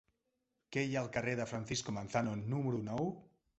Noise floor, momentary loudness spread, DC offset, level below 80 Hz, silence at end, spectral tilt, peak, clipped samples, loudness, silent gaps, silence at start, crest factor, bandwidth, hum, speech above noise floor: -85 dBFS; 3 LU; under 0.1%; -66 dBFS; 0.35 s; -5.5 dB/octave; -18 dBFS; under 0.1%; -38 LUFS; none; 0.7 s; 20 dB; 8.2 kHz; none; 47 dB